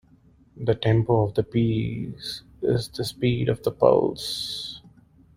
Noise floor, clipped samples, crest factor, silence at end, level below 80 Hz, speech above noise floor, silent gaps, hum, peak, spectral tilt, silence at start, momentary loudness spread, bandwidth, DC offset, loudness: -56 dBFS; under 0.1%; 22 dB; 0.55 s; -50 dBFS; 33 dB; none; none; -4 dBFS; -6.5 dB/octave; 0.55 s; 13 LU; 15.5 kHz; under 0.1%; -24 LUFS